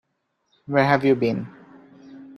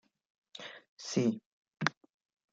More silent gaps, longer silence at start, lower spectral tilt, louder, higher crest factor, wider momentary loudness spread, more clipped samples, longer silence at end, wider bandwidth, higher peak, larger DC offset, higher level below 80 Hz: second, none vs 0.88-0.97 s, 1.46-1.62 s; first, 0.7 s vs 0.55 s; first, -8 dB/octave vs -4.5 dB/octave; first, -21 LUFS vs -35 LUFS; second, 22 dB vs 30 dB; second, 13 LU vs 16 LU; neither; second, 0.05 s vs 0.6 s; first, 12 kHz vs 7.8 kHz; first, -2 dBFS vs -8 dBFS; neither; first, -64 dBFS vs -80 dBFS